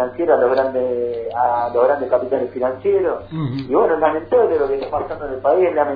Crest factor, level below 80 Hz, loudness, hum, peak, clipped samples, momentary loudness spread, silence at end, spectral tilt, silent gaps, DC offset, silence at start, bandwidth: 16 dB; -48 dBFS; -18 LUFS; none; 0 dBFS; under 0.1%; 8 LU; 0 s; -10 dB/octave; none; under 0.1%; 0 s; 5 kHz